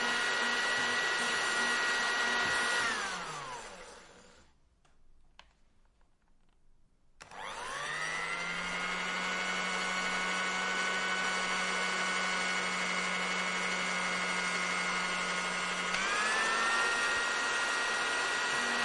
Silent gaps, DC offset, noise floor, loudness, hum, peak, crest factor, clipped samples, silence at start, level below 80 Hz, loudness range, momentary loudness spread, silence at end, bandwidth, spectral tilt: none; under 0.1%; -66 dBFS; -31 LUFS; none; -16 dBFS; 18 dB; under 0.1%; 0 s; -64 dBFS; 11 LU; 7 LU; 0 s; 11.5 kHz; -1 dB/octave